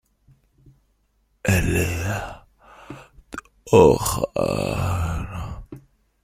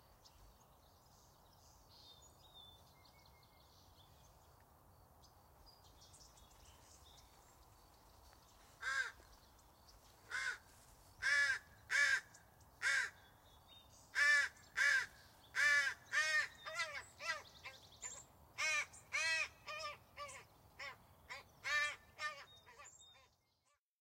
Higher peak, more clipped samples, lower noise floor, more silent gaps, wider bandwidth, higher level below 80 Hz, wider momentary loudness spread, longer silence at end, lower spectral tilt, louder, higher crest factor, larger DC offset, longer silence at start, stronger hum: first, -2 dBFS vs -24 dBFS; neither; second, -66 dBFS vs -82 dBFS; neither; about the same, 16 kHz vs 16 kHz; first, -38 dBFS vs -72 dBFS; about the same, 26 LU vs 26 LU; second, 0.45 s vs 0.95 s; first, -5.5 dB/octave vs 0.5 dB/octave; first, -21 LUFS vs -39 LUFS; about the same, 22 dB vs 20 dB; neither; first, 1.45 s vs 0.4 s; neither